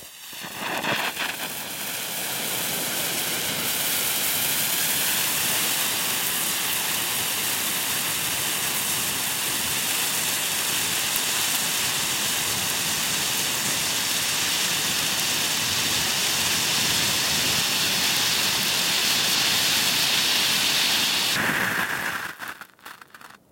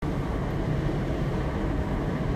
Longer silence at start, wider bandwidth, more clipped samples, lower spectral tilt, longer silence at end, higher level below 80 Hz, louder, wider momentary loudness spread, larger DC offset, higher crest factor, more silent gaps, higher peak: about the same, 0 s vs 0 s; first, 17 kHz vs 14 kHz; neither; second, 0 dB/octave vs -8 dB/octave; first, 0.15 s vs 0 s; second, -60 dBFS vs -34 dBFS; first, -21 LUFS vs -29 LUFS; first, 7 LU vs 2 LU; neither; first, 24 dB vs 12 dB; neither; first, 0 dBFS vs -16 dBFS